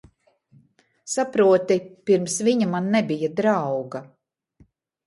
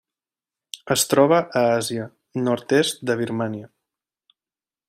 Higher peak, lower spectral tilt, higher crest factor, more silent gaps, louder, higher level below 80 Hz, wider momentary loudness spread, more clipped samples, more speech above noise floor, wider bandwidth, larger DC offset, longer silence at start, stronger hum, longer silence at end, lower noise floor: second, -8 dBFS vs -4 dBFS; about the same, -5 dB/octave vs -4 dB/octave; about the same, 16 dB vs 20 dB; neither; about the same, -22 LUFS vs -21 LUFS; about the same, -68 dBFS vs -66 dBFS; second, 11 LU vs 15 LU; neither; second, 39 dB vs over 69 dB; second, 11.5 kHz vs 16 kHz; neither; first, 1.05 s vs 0.75 s; neither; second, 1 s vs 1.2 s; second, -60 dBFS vs under -90 dBFS